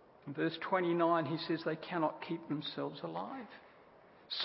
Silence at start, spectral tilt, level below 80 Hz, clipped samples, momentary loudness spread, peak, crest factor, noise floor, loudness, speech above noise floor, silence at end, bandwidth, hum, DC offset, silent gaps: 0.2 s; -3.5 dB/octave; -82 dBFS; under 0.1%; 14 LU; -18 dBFS; 20 dB; -61 dBFS; -37 LUFS; 25 dB; 0 s; 5.6 kHz; none; under 0.1%; none